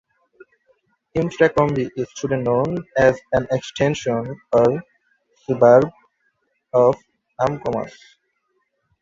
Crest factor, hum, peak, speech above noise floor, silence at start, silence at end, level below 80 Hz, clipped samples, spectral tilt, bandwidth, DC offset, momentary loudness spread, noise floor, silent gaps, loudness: 18 dB; none; -2 dBFS; 52 dB; 1.15 s; 1.15 s; -52 dBFS; under 0.1%; -6.5 dB/octave; 7.6 kHz; under 0.1%; 11 LU; -70 dBFS; none; -19 LUFS